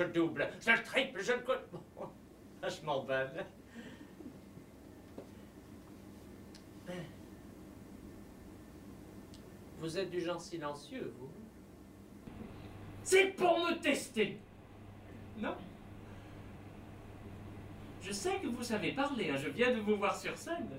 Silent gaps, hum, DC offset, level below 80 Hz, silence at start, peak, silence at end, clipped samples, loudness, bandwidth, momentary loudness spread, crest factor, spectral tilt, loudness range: none; none; under 0.1%; -64 dBFS; 0 s; -14 dBFS; 0 s; under 0.1%; -35 LUFS; 16 kHz; 23 LU; 24 dB; -4 dB/octave; 17 LU